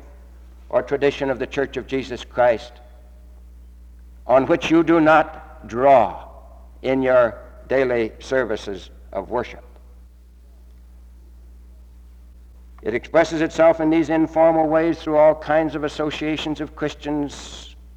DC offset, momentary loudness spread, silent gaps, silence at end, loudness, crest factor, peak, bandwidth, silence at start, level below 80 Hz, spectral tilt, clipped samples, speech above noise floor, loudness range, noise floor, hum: under 0.1%; 16 LU; none; 0.15 s; -20 LUFS; 18 dB; -2 dBFS; 9 kHz; 0 s; -44 dBFS; -6 dB/octave; under 0.1%; 27 dB; 11 LU; -46 dBFS; 60 Hz at -45 dBFS